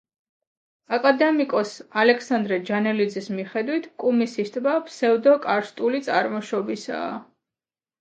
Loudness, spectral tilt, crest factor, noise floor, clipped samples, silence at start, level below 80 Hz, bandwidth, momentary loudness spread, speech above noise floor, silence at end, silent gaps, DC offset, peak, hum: -23 LUFS; -5.5 dB/octave; 20 dB; under -90 dBFS; under 0.1%; 0.9 s; -76 dBFS; 9 kHz; 10 LU; over 68 dB; 0.75 s; none; under 0.1%; -4 dBFS; none